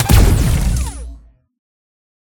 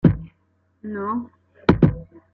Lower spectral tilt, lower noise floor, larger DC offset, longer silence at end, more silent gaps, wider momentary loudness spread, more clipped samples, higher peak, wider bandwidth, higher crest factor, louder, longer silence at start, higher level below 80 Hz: second, -5.5 dB/octave vs -10 dB/octave; second, -39 dBFS vs -65 dBFS; neither; first, 1.1 s vs 0.3 s; neither; about the same, 21 LU vs 20 LU; neither; about the same, 0 dBFS vs -2 dBFS; first, 19 kHz vs 5 kHz; about the same, 16 dB vs 20 dB; first, -15 LUFS vs -22 LUFS; about the same, 0 s vs 0.05 s; first, -18 dBFS vs -38 dBFS